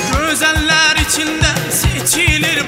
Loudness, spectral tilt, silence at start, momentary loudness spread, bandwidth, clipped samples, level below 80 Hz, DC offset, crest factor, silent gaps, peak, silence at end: -12 LUFS; -2.5 dB/octave; 0 s; 4 LU; 16.5 kHz; under 0.1%; -26 dBFS; under 0.1%; 14 dB; none; 0 dBFS; 0 s